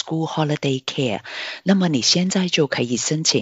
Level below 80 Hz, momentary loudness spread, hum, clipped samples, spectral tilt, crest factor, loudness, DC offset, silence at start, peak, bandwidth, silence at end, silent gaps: -64 dBFS; 8 LU; none; under 0.1%; -4 dB/octave; 16 dB; -20 LUFS; under 0.1%; 0.05 s; -4 dBFS; 8.2 kHz; 0 s; none